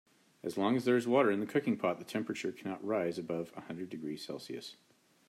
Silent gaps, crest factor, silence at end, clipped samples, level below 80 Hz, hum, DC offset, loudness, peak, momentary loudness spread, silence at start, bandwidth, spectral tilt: none; 20 dB; 0.55 s; under 0.1%; -82 dBFS; none; under 0.1%; -35 LUFS; -14 dBFS; 15 LU; 0.45 s; 14.5 kHz; -6 dB/octave